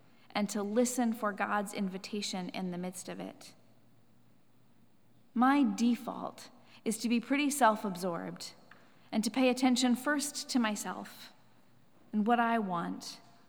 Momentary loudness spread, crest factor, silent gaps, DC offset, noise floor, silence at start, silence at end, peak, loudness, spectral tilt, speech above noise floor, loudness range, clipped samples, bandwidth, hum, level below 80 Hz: 16 LU; 22 dB; none; under 0.1%; -67 dBFS; 0.35 s; 0.3 s; -12 dBFS; -32 LUFS; -4 dB/octave; 35 dB; 7 LU; under 0.1%; over 20 kHz; none; -88 dBFS